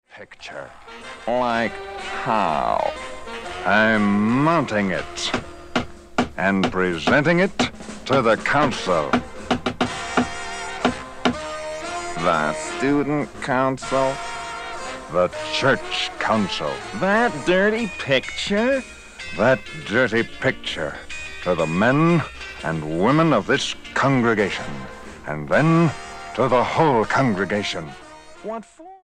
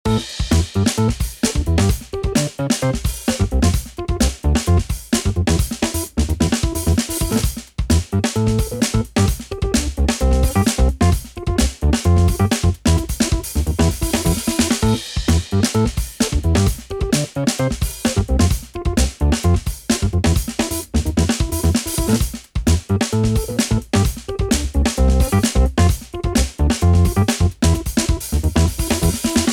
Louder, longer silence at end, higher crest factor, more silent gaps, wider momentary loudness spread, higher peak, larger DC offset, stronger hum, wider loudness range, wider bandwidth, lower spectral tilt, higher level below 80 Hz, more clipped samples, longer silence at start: about the same, -21 LUFS vs -19 LUFS; about the same, 0.05 s vs 0 s; first, 18 dB vs 12 dB; neither; first, 14 LU vs 5 LU; about the same, -2 dBFS vs -4 dBFS; neither; neither; about the same, 3 LU vs 2 LU; second, 11.5 kHz vs 18.5 kHz; about the same, -5.5 dB/octave vs -5 dB/octave; second, -46 dBFS vs -24 dBFS; neither; about the same, 0.15 s vs 0.05 s